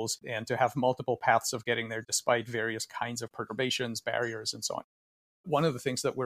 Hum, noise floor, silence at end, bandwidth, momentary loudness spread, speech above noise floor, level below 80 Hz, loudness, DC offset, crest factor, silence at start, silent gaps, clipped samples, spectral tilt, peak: none; under -90 dBFS; 0 s; 15.5 kHz; 8 LU; over 59 dB; -70 dBFS; -31 LUFS; under 0.1%; 22 dB; 0 s; 4.84-5.44 s; under 0.1%; -3.5 dB/octave; -10 dBFS